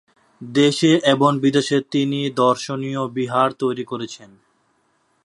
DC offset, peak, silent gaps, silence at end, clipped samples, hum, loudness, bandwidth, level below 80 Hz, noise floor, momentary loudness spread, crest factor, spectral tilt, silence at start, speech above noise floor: under 0.1%; 0 dBFS; none; 1 s; under 0.1%; none; -19 LUFS; 11.5 kHz; -68 dBFS; -65 dBFS; 12 LU; 20 dB; -5.5 dB/octave; 0.4 s; 46 dB